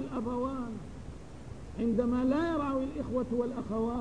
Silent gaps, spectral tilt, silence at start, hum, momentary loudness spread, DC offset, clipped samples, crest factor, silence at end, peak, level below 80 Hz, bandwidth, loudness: none; -8 dB/octave; 0 s; none; 18 LU; 0.3%; under 0.1%; 16 dB; 0 s; -16 dBFS; -50 dBFS; 10 kHz; -32 LUFS